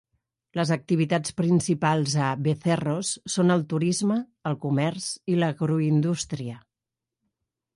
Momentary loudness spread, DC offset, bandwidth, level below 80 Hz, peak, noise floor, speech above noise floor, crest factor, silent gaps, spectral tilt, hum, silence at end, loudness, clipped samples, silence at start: 9 LU; under 0.1%; 11.5 kHz; -62 dBFS; -10 dBFS; -88 dBFS; 64 dB; 16 dB; none; -5.5 dB/octave; none; 1.15 s; -25 LUFS; under 0.1%; 0.55 s